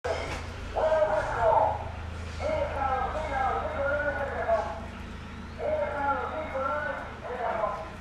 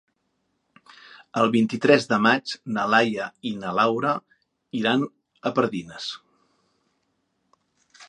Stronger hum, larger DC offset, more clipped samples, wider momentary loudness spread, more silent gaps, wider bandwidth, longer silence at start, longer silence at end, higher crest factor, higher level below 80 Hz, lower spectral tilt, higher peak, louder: neither; neither; neither; about the same, 12 LU vs 14 LU; neither; first, 11.5 kHz vs 10 kHz; second, 0.05 s vs 1.35 s; about the same, 0 s vs 0.05 s; about the same, 18 dB vs 22 dB; first, -42 dBFS vs -70 dBFS; about the same, -6 dB/octave vs -5.5 dB/octave; second, -12 dBFS vs -2 dBFS; second, -29 LUFS vs -23 LUFS